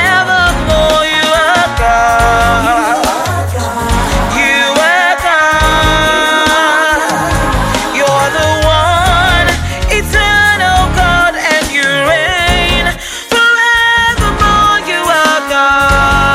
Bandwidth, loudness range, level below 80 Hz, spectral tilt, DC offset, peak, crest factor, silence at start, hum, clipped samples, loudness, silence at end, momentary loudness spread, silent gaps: 16.5 kHz; 2 LU; -20 dBFS; -3.5 dB/octave; under 0.1%; 0 dBFS; 10 dB; 0 s; none; under 0.1%; -9 LUFS; 0 s; 5 LU; none